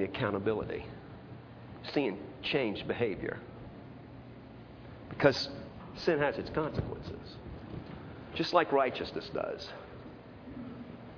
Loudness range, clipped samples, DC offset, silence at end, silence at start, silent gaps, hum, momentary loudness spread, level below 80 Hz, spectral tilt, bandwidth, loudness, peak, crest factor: 3 LU; under 0.1%; under 0.1%; 0 s; 0 s; none; none; 20 LU; -56 dBFS; -4 dB/octave; 5.4 kHz; -33 LUFS; -8 dBFS; 28 dB